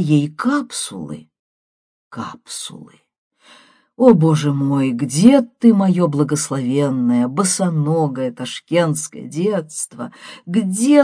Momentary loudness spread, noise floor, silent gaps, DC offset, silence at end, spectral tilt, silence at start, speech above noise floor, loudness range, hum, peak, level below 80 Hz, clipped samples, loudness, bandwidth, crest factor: 18 LU; -49 dBFS; 1.39-2.11 s, 3.18-3.31 s; under 0.1%; 0 s; -6 dB/octave; 0 s; 33 dB; 11 LU; none; 0 dBFS; -62 dBFS; under 0.1%; -17 LUFS; 10.5 kHz; 18 dB